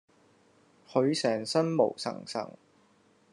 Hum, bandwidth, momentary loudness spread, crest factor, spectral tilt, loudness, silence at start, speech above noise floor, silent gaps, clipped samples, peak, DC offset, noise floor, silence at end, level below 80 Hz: none; 11 kHz; 11 LU; 22 dB; -5 dB/octave; -29 LUFS; 0.9 s; 36 dB; none; under 0.1%; -10 dBFS; under 0.1%; -65 dBFS; 0.8 s; -82 dBFS